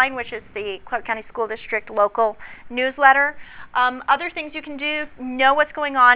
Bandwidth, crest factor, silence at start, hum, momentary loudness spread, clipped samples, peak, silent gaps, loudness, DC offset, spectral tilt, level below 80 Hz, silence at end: 4 kHz; 20 dB; 0 s; none; 14 LU; under 0.1%; 0 dBFS; none; -21 LUFS; under 0.1%; -6 dB/octave; -54 dBFS; 0 s